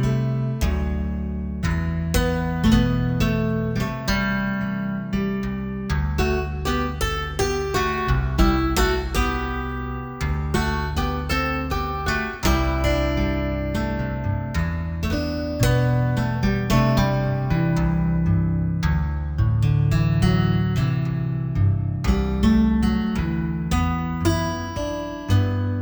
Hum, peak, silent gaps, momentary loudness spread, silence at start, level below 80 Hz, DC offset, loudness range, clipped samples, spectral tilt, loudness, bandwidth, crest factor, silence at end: none; -4 dBFS; none; 7 LU; 0 s; -28 dBFS; under 0.1%; 3 LU; under 0.1%; -6.5 dB/octave; -23 LUFS; over 20 kHz; 16 dB; 0 s